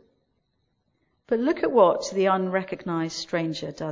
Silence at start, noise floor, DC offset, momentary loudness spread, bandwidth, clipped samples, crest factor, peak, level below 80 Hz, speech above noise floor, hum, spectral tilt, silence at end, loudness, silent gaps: 1.3 s; -73 dBFS; under 0.1%; 10 LU; 7.6 kHz; under 0.1%; 20 dB; -4 dBFS; -64 dBFS; 49 dB; none; -5.5 dB/octave; 0 s; -24 LUFS; none